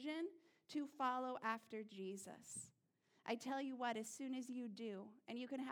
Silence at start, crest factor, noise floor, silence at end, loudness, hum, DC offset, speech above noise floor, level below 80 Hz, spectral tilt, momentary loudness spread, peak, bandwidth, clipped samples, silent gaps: 0 s; 20 dB; -80 dBFS; 0 s; -48 LUFS; none; under 0.1%; 33 dB; under -90 dBFS; -3.5 dB/octave; 10 LU; -28 dBFS; 19 kHz; under 0.1%; none